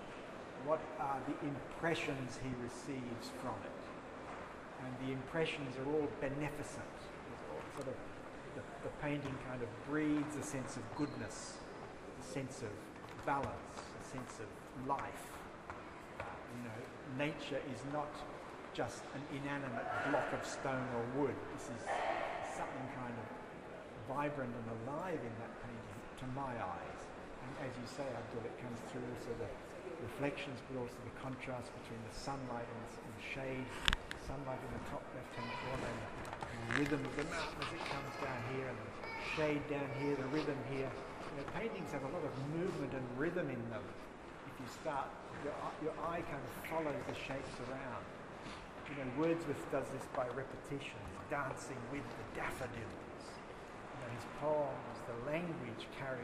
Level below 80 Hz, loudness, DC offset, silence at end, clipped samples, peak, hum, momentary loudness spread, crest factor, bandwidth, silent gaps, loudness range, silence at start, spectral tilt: -60 dBFS; -43 LUFS; under 0.1%; 0 s; under 0.1%; -10 dBFS; none; 11 LU; 32 dB; 15 kHz; none; 5 LU; 0 s; -5.5 dB/octave